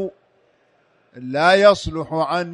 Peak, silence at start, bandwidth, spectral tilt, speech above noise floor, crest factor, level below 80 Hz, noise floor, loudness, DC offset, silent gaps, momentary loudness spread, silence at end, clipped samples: 0 dBFS; 0 s; 10.5 kHz; -5 dB/octave; 43 dB; 18 dB; -46 dBFS; -60 dBFS; -17 LUFS; under 0.1%; none; 17 LU; 0 s; under 0.1%